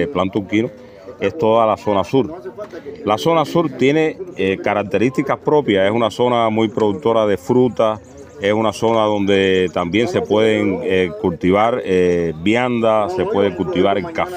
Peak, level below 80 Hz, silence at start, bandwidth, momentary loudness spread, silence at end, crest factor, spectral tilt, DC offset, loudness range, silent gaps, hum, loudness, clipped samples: -2 dBFS; -50 dBFS; 0 s; 15.5 kHz; 5 LU; 0 s; 16 dB; -6.5 dB/octave; under 0.1%; 2 LU; none; none; -17 LUFS; under 0.1%